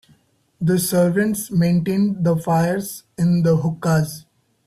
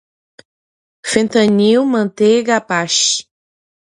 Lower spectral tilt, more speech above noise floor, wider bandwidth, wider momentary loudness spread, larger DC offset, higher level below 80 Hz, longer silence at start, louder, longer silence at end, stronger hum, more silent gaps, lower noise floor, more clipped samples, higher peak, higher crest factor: first, -6.5 dB/octave vs -3.5 dB/octave; second, 39 dB vs over 77 dB; first, 14.5 kHz vs 11.5 kHz; about the same, 8 LU vs 6 LU; neither; first, -54 dBFS vs -60 dBFS; second, 0.6 s vs 1.05 s; second, -19 LUFS vs -14 LUFS; second, 0.5 s vs 0.75 s; neither; neither; second, -58 dBFS vs under -90 dBFS; neither; second, -6 dBFS vs 0 dBFS; about the same, 14 dB vs 16 dB